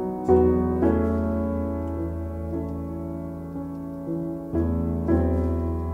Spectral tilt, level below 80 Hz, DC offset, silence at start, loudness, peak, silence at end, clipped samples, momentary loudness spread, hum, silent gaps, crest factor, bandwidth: -11 dB/octave; -34 dBFS; under 0.1%; 0 s; -26 LUFS; -8 dBFS; 0 s; under 0.1%; 12 LU; none; none; 16 dB; 3.3 kHz